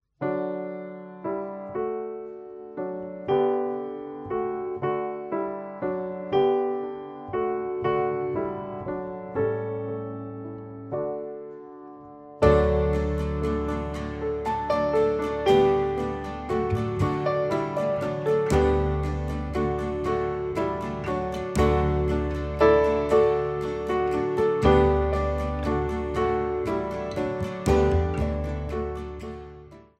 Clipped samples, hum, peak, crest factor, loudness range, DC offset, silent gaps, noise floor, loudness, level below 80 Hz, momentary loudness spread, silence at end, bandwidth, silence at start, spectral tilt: under 0.1%; none; -6 dBFS; 20 dB; 7 LU; under 0.1%; none; -46 dBFS; -26 LUFS; -36 dBFS; 14 LU; 0.2 s; 12 kHz; 0.2 s; -7.5 dB/octave